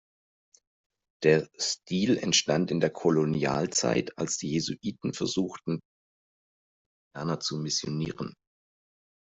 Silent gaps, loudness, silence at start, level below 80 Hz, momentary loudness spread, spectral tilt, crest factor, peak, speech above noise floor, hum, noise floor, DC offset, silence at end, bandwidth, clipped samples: 5.85-7.11 s; -28 LUFS; 1.2 s; -64 dBFS; 11 LU; -4 dB/octave; 20 dB; -10 dBFS; over 62 dB; none; under -90 dBFS; under 0.1%; 1 s; 8.2 kHz; under 0.1%